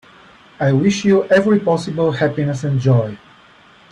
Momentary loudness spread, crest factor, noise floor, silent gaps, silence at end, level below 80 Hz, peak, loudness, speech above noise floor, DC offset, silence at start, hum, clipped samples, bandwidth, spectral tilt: 6 LU; 14 dB; -47 dBFS; none; 0.75 s; -54 dBFS; -4 dBFS; -16 LUFS; 32 dB; under 0.1%; 0.6 s; none; under 0.1%; 10.5 kHz; -7 dB/octave